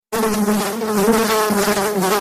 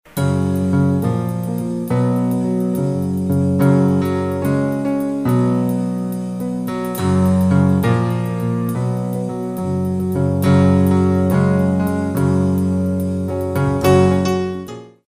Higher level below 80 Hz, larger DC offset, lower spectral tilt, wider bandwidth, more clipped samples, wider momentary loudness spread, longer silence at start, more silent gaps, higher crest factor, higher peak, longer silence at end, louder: about the same, -46 dBFS vs -44 dBFS; second, under 0.1% vs 0.2%; second, -4 dB/octave vs -8 dB/octave; about the same, 15.5 kHz vs 16 kHz; neither; second, 4 LU vs 9 LU; about the same, 0.1 s vs 0.15 s; neither; about the same, 12 dB vs 14 dB; about the same, -4 dBFS vs -2 dBFS; second, 0 s vs 0.2 s; about the same, -17 LUFS vs -17 LUFS